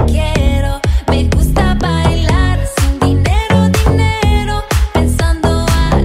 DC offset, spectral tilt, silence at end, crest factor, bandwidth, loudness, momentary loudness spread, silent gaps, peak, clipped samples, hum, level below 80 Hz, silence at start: under 0.1%; -6 dB/octave; 0 s; 10 dB; 16 kHz; -13 LUFS; 4 LU; none; 0 dBFS; under 0.1%; none; -14 dBFS; 0 s